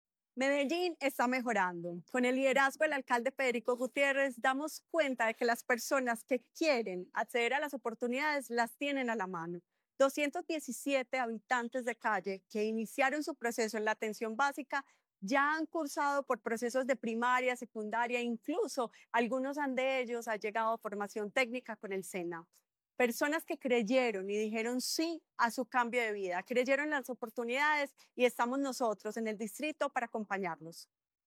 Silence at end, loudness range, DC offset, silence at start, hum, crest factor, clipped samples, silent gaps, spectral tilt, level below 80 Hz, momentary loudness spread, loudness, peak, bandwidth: 0.4 s; 3 LU; under 0.1%; 0.35 s; none; 18 dB; under 0.1%; none; -3.5 dB/octave; under -90 dBFS; 8 LU; -34 LUFS; -16 dBFS; 17.5 kHz